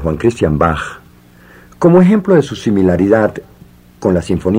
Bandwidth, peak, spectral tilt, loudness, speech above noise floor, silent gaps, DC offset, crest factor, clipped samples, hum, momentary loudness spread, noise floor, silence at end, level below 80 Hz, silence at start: 10.5 kHz; 0 dBFS; -8 dB/octave; -13 LUFS; 31 dB; none; under 0.1%; 14 dB; under 0.1%; none; 10 LU; -42 dBFS; 0 s; -36 dBFS; 0 s